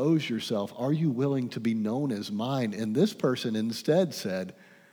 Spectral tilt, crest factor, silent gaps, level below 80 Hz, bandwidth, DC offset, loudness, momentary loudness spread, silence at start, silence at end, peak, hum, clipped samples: -6.5 dB/octave; 16 dB; none; -82 dBFS; over 20 kHz; under 0.1%; -29 LUFS; 6 LU; 0 s; 0.4 s; -12 dBFS; none; under 0.1%